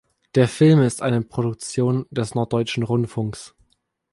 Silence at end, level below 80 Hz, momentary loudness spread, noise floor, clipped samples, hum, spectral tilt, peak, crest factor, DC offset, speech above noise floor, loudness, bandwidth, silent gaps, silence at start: 0.65 s; -56 dBFS; 11 LU; -66 dBFS; under 0.1%; none; -6.5 dB/octave; -4 dBFS; 18 dB; under 0.1%; 47 dB; -21 LUFS; 11.5 kHz; none; 0.35 s